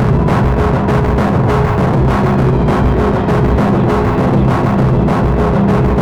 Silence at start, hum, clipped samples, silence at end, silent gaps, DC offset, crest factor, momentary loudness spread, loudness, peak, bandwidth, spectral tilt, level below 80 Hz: 0 s; none; under 0.1%; 0 s; none; under 0.1%; 10 dB; 1 LU; -12 LUFS; -2 dBFS; 9.4 kHz; -9 dB/octave; -20 dBFS